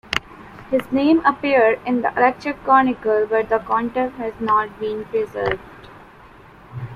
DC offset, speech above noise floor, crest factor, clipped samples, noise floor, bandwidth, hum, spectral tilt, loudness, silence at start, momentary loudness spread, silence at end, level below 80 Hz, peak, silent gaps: under 0.1%; 26 dB; 20 dB; under 0.1%; -45 dBFS; 14 kHz; none; -6 dB/octave; -19 LUFS; 0.1 s; 10 LU; 0 s; -50 dBFS; 0 dBFS; none